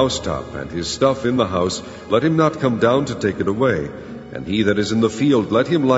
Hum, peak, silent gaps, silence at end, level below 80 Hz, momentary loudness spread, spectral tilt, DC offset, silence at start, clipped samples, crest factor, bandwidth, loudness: none; -2 dBFS; none; 0 s; -44 dBFS; 11 LU; -5.5 dB/octave; under 0.1%; 0 s; under 0.1%; 16 dB; 8 kHz; -19 LUFS